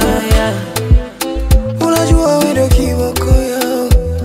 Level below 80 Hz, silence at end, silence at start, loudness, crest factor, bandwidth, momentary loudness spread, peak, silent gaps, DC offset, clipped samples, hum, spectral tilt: -16 dBFS; 0 s; 0 s; -13 LUFS; 12 dB; 16.5 kHz; 5 LU; 0 dBFS; none; under 0.1%; under 0.1%; none; -5.5 dB/octave